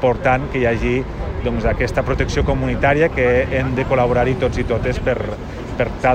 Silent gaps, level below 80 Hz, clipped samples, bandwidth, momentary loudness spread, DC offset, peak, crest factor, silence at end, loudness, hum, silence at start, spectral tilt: none; -28 dBFS; under 0.1%; 9.4 kHz; 7 LU; under 0.1%; -4 dBFS; 14 dB; 0 s; -18 LUFS; none; 0 s; -7 dB/octave